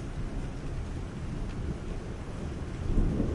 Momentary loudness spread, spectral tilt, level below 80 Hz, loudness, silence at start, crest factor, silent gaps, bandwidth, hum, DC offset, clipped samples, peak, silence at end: 7 LU; -7.5 dB/octave; -34 dBFS; -36 LUFS; 0 s; 18 dB; none; 11 kHz; none; under 0.1%; under 0.1%; -14 dBFS; 0 s